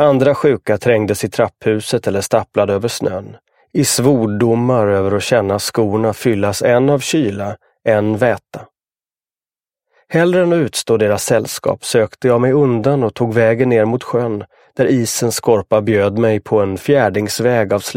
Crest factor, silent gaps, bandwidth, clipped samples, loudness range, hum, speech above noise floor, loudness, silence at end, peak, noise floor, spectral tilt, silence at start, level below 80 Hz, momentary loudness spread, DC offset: 14 dB; none; 16.5 kHz; under 0.1%; 3 LU; none; over 76 dB; -15 LUFS; 0 s; 0 dBFS; under -90 dBFS; -5.5 dB/octave; 0 s; -54 dBFS; 7 LU; under 0.1%